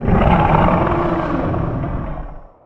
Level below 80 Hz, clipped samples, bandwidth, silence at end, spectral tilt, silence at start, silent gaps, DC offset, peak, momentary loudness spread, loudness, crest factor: -24 dBFS; under 0.1%; 5.8 kHz; 0.2 s; -9.5 dB/octave; 0 s; none; under 0.1%; 0 dBFS; 15 LU; -17 LUFS; 16 dB